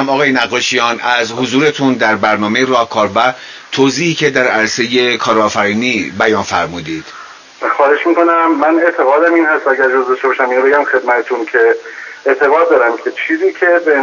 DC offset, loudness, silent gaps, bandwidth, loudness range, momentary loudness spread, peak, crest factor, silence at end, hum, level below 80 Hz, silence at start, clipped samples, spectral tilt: under 0.1%; -12 LUFS; none; 7.4 kHz; 2 LU; 7 LU; 0 dBFS; 12 dB; 0 s; none; -52 dBFS; 0 s; under 0.1%; -4 dB/octave